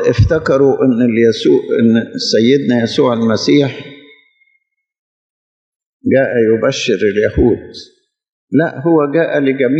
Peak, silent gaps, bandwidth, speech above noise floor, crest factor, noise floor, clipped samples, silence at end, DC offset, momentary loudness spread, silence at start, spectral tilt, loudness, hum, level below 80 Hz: 0 dBFS; 4.99-5.80 s, 5.86-6.00 s, 8.29-8.47 s; 8.2 kHz; 51 dB; 14 dB; -63 dBFS; under 0.1%; 0 s; under 0.1%; 4 LU; 0 s; -6 dB/octave; -13 LUFS; none; -36 dBFS